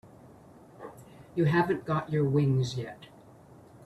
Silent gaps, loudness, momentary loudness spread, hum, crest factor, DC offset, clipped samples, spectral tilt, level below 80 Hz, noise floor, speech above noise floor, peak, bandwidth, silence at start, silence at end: none; -28 LUFS; 22 LU; none; 18 dB; under 0.1%; under 0.1%; -7.5 dB/octave; -62 dBFS; -53 dBFS; 26 dB; -14 dBFS; 12 kHz; 0.05 s; 0.8 s